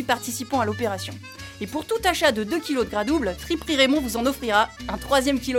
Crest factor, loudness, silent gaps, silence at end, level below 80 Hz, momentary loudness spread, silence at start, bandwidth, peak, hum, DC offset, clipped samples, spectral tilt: 18 dB; -23 LUFS; none; 0 s; -44 dBFS; 12 LU; 0 s; 17 kHz; -6 dBFS; none; under 0.1%; under 0.1%; -3.5 dB/octave